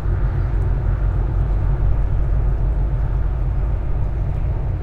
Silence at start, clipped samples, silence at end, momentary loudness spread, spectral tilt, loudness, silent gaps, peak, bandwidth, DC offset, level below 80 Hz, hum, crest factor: 0 s; under 0.1%; 0 s; 2 LU; -10 dB/octave; -22 LUFS; none; -6 dBFS; 3 kHz; under 0.1%; -20 dBFS; none; 12 dB